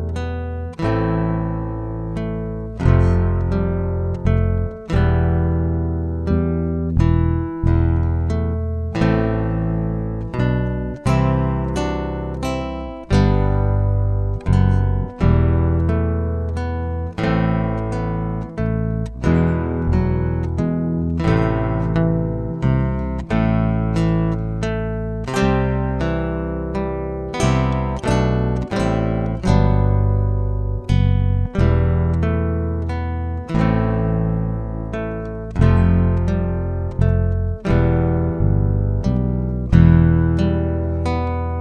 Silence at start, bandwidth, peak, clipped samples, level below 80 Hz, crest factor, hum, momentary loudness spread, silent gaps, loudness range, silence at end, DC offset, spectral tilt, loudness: 0 s; 9.6 kHz; 0 dBFS; under 0.1%; -26 dBFS; 18 dB; none; 8 LU; none; 3 LU; 0 s; under 0.1%; -8.5 dB/octave; -20 LUFS